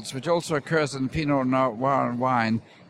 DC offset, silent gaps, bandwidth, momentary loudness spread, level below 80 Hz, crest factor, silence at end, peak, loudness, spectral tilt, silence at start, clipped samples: under 0.1%; none; 12.5 kHz; 4 LU; -52 dBFS; 16 dB; 0.3 s; -10 dBFS; -24 LUFS; -6 dB/octave; 0 s; under 0.1%